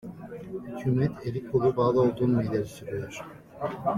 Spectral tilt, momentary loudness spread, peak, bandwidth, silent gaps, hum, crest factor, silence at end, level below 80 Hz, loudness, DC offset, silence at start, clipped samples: -8.5 dB/octave; 17 LU; -12 dBFS; 14.5 kHz; none; none; 16 dB; 0 s; -56 dBFS; -27 LUFS; under 0.1%; 0.05 s; under 0.1%